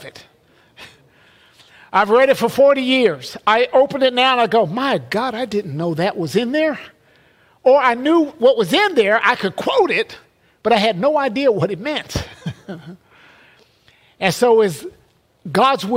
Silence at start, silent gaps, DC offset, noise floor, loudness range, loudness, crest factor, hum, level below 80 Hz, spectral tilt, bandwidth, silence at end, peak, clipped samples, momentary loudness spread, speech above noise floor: 0 s; none; under 0.1%; -54 dBFS; 6 LU; -16 LUFS; 16 dB; none; -50 dBFS; -5 dB/octave; 16 kHz; 0 s; -2 dBFS; under 0.1%; 12 LU; 38 dB